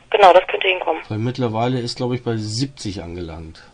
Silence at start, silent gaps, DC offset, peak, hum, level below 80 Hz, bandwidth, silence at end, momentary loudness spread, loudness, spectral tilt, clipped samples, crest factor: 0.1 s; none; under 0.1%; 0 dBFS; none; -50 dBFS; 10.5 kHz; 0.15 s; 19 LU; -18 LUFS; -5.5 dB/octave; under 0.1%; 18 dB